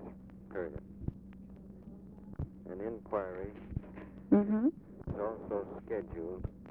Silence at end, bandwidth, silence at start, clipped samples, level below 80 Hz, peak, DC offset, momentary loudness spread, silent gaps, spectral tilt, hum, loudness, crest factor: 0 s; 3.4 kHz; 0 s; under 0.1%; -54 dBFS; -14 dBFS; under 0.1%; 21 LU; none; -11.5 dB/octave; none; -37 LUFS; 24 dB